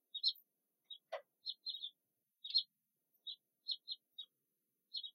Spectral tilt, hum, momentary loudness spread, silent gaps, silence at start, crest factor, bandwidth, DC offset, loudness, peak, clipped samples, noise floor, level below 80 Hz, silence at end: 1 dB/octave; none; 17 LU; none; 0.15 s; 24 dB; 16 kHz; under 0.1%; -43 LUFS; -24 dBFS; under 0.1%; -88 dBFS; under -90 dBFS; 0.05 s